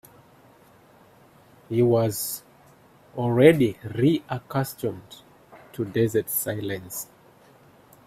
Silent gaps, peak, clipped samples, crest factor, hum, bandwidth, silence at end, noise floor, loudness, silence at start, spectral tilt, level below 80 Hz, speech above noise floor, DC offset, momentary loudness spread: none; -2 dBFS; under 0.1%; 24 dB; none; 16 kHz; 1 s; -54 dBFS; -24 LUFS; 1.7 s; -6 dB/octave; -62 dBFS; 31 dB; under 0.1%; 18 LU